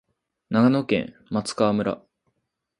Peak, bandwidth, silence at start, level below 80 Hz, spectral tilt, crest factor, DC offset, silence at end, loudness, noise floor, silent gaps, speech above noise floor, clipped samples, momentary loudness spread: -6 dBFS; 11 kHz; 0.5 s; -60 dBFS; -6 dB/octave; 20 dB; under 0.1%; 0.8 s; -23 LUFS; -77 dBFS; none; 55 dB; under 0.1%; 10 LU